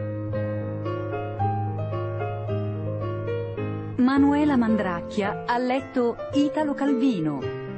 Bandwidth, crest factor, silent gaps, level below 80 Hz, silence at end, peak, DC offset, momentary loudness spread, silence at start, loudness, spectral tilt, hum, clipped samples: 8.6 kHz; 14 dB; none; -52 dBFS; 0 s; -10 dBFS; under 0.1%; 9 LU; 0 s; -25 LUFS; -8 dB/octave; none; under 0.1%